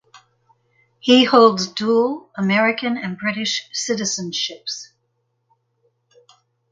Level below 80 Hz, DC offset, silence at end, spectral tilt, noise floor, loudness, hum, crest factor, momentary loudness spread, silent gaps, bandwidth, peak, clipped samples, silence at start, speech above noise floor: -68 dBFS; under 0.1%; 1.85 s; -3.5 dB/octave; -70 dBFS; -18 LUFS; none; 20 dB; 12 LU; none; 9.4 kHz; 0 dBFS; under 0.1%; 0.15 s; 52 dB